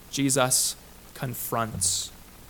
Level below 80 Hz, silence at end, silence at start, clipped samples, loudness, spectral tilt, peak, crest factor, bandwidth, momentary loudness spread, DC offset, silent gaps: -52 dBFS; 0 s; 0 s; under 0.1%; -25 LUFS; -2.5 dB/octave; -8 dBFS; 20 dB; 19 kHz; 16 LU; under 0.1%; none